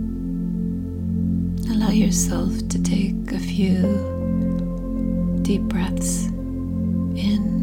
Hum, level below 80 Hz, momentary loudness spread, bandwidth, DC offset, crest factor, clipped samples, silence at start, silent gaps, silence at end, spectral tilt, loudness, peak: none; -32 dBFS; 7 LU; 16.5 kHz; under 0.1%; 14 dB; under 0.1%; 0 s; none; 0 s; -6 dB/octave; -22 LUFS; -8 dBFS